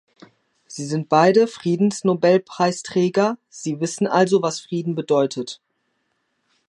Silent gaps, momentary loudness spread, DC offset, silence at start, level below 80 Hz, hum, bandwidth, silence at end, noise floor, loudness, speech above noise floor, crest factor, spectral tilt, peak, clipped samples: none; 13 LU; under 0.1%; 0.7 s; -70 dBFS; none; 11.5 kHz; 1.15 s; -71 dBFS; -20 LUFS; 51 dB; 18 dB; -5.5 dB/octave; -2 dBFS; under 0.1%